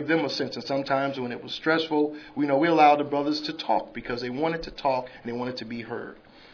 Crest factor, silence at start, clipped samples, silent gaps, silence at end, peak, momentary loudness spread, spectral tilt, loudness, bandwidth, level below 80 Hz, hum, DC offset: 20 dB; 0 s; under 0.1%; none; 0.35 s; -6 dBFS; 15 LU; -5.5 dB/octave; -26 LUFS; 5.4 kHz; -56 dBFS; none; under 0.1%